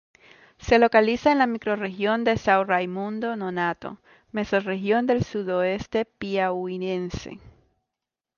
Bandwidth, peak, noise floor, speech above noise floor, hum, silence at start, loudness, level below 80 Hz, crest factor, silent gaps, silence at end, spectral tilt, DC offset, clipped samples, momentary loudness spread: 7.2 kHz; -6 dBFS; -87 dBFS; 63 dB; none; 0.6 s; -24 LUFS; -52 dBFS; 20 dB; none; 0.9 s; -6 dB/octave; under 0.1%; under 0.1%; 12 LU